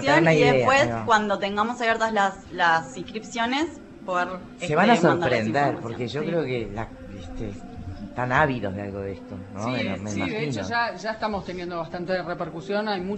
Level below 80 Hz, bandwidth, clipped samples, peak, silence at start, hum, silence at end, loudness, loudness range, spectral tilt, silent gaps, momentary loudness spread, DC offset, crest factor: -50 dBFS; 8.4 kHz; under 0.1%; -4 dBFS; 0 s; none; 0 s; -24 LUFS; 6 LU; -5.5 dB/octave; none; 17 LU; under 0.1%; 20 dB